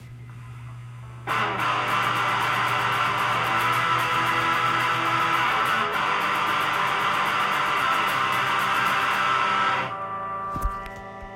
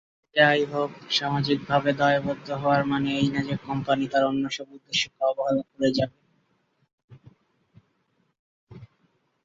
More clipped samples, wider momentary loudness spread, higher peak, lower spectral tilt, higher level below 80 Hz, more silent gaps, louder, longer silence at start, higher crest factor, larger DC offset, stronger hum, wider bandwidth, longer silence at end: neither; first, 15 LU vs 9 LU; second, -10 dBFS vs -4 dBFS; second, -3 dB/octave vs -5 dB/octave; first, -46 dBFS vs -60 dBFS; second, none vs 6.93-6.98 s, 7.04-7.08 s, 8.39-8.67 s; first, -22 LUFS vs -25 LUFS; second, 0 s vs 0.35 s; second, 14 dB vs 24 dB; neither; neither; first, 16.5 kHz vs 7.8 kHz; second, 0 s vs 0.6 s